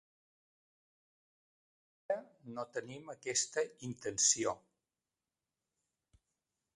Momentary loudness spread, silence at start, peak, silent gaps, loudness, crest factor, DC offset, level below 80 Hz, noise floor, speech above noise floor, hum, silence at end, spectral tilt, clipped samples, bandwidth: 17 LU; 2.1 s; -14 dBFS; none; -36 LUFS; 28 dB; under 0.1%; -78 dBFS; under -90 dBFS; over 53 dB; none; 2.2 s; -1.5 dB/octave; under 0.1%; 11.5 kHz